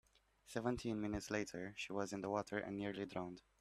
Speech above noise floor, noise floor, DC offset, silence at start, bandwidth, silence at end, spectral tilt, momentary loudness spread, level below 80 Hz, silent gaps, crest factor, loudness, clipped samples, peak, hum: 22 dB; -66 dBFS; under 0.1%; 0.45 s; 14.5 kHz; 0.2 s; -5 dB/octave; 5 LU; -66 dBFS; none; 20 dB; -44 LUFS; under 0.1%; -24 dBFS; none